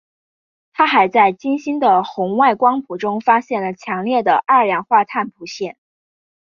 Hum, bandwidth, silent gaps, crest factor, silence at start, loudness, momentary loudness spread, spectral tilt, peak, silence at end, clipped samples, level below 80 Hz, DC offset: none; 7.2 kHz; none; 16 dB; 0.8 s; -16 LUFS; 13 LU; -5.5 dB/octave; -2 dBFS; 0.75 s; under 0.1%; -66 dBFS; under 0.1%